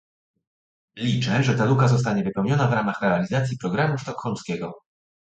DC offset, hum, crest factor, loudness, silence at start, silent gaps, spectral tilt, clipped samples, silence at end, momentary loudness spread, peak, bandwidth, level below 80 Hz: under 0.1%; none; 18 dB; -23 LUFS; 0.95 s; none; -6.5 dB/octave; under 0.1%; 0.45 s; 10 LU; -6 dBFS; 8.2 kHz; -56 dBFS